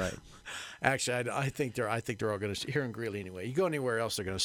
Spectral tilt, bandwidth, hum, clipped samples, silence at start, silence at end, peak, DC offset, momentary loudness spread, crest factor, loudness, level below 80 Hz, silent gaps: -4 dB/octave; 17 kHz; none; under 0.1%; 0 s; 0 s; -8 dBFS; under 0.1%; 8 LU; 26 dB; -33 LUFS; -60 dBFS; none